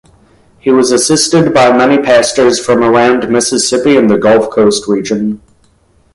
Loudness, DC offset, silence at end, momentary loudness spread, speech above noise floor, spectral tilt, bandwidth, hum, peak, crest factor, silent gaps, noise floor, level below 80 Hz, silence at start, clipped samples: -9 LUFS; under 0.1%; 0.8 s; 6 LU; 41 dB; -4 dB/octave; 11.5 kHz; none; 0 dBFS; 10 dB; none; -50 dBFS; -46 dBFS; 0.65 s; under 0.1%